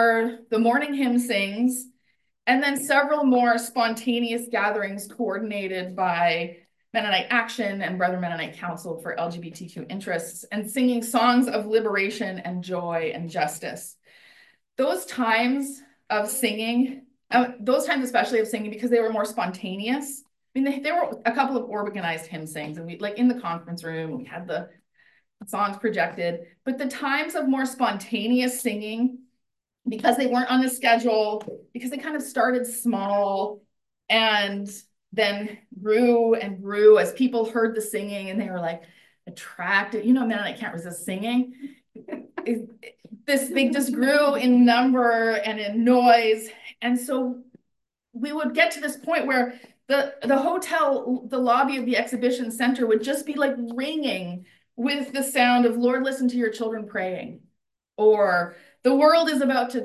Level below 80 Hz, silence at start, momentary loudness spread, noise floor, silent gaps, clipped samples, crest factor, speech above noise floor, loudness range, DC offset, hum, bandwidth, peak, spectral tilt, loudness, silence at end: -76 dBFS; 0 s; 14 LU; -81 dBFS; none; under 0.1%; 20 dB; 57 dB; 6 LU; under 0.1%; none; 12.5 kHz; -4 dBFS; -4 dB/octave; -24 LUFS; 0 s